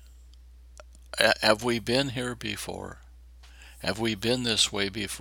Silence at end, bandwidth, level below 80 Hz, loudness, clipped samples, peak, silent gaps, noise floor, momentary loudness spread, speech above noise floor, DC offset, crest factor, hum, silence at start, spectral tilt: 0 s; 19.5 kHz; -50 dBFS; -26 LUFS; under 0.1%; -2 dBFS; none; -50 dBFS; 13 LU; 23 dB; under 0.1%; 28 dB; none; 0 s; -3 dB/octave